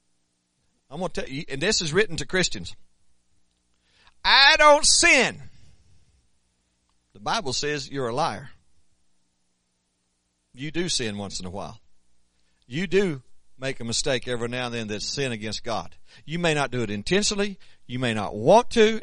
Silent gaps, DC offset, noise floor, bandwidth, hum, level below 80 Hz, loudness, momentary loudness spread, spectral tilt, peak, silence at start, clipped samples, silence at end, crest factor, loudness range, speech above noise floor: none; under 0.1%; -73 dBFS; 10.5 kHz; 60 Hz at -60 dBFS; -48 dBFS; -22 LUFS; 19 LU; -2.5 dB/octave; -2 dBFS; 0.9 s; under 0.1%; 0 s; 24 dB; 14 LU; 49 dB